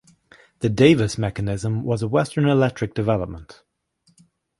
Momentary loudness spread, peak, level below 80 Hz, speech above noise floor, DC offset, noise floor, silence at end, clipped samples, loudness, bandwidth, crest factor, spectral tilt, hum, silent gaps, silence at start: 10 LU; -2 dBFS; -46 dBFS; 44 dB; under 0.1%; -64 dBFS; 1.05 s; under 0.1%; -21 LUFS; 11.5 kHz; 20 dB; -6.5 dB/octave; none; none; 0.6 s